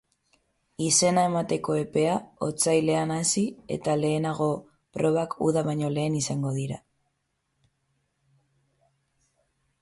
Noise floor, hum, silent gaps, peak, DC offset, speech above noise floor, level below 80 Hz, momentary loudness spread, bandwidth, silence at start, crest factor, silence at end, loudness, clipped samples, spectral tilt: -77 dBFS; none; none; -10 dBFS; under 0.1%; 51 dB; -64 dBFS; 9 LU; 12 kHz; 0.8 s; 18 dB; 3.05 s; -26 LUFS; under 0.1%; -4.5 dB/octave